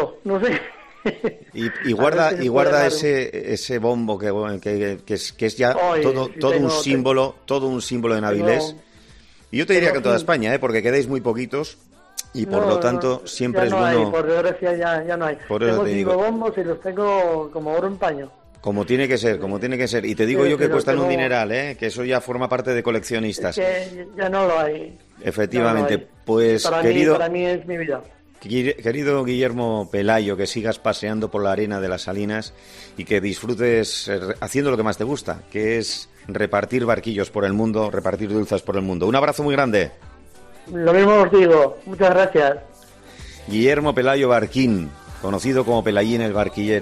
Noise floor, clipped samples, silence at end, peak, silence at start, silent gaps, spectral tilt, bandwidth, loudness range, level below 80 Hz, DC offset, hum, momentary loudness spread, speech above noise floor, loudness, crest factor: -48 dBFS; under 0.1%; 0 s; -4 dBFS; 0 s; none; -5.5 dB/octave; 14 kHz; 5 LU; -50 dBFS; under 0.1%; none; 10 LU; 28 dB; -20 LUFS; 16 dB